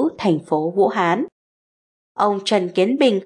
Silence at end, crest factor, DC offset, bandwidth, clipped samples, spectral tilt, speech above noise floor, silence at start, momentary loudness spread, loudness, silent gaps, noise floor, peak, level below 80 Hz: 0 s; 14 dB; under 0.1%; 11 kHz; under 0.1%; -5.5 dB/octave; over 72 dB; 0 s; 6 LU; -19 LUFS; 1.32-2.15 s; under -90 dBFS; -4 dBFS; -68 dBFS